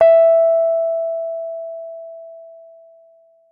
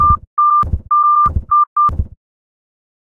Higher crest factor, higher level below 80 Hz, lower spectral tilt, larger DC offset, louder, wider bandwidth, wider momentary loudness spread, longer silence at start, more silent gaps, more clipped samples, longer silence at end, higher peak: about the same, 14 dB vs 14 dB; second, -68 dBFS vs -26 dBFS; second, -6 dB/octave vs -9.5 dB/octave; neither; second, -16 LUFS vs -13 LUFS; first, 3.5 kHz vs 2.4 kHz; first, 24 LU vs 4 LU; about the same, 0 s vs 0 s; second, none vs 0.27-0.37 s, 1.67-1.76 s; neither; about the same, 1 s vs 1.1 s; second, -4 dBFS vs 0 dBFS